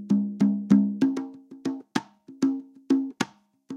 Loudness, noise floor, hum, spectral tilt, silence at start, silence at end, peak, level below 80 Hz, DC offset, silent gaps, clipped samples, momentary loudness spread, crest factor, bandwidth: -26 LUFS; -44 dBFS; none; -6.5 dB/octave; 0 s; 0 s; -6 dBFS; -70 dBFS; under 0.1%; none; under 0.1%; 13 LU; 20 dB; 11 kHz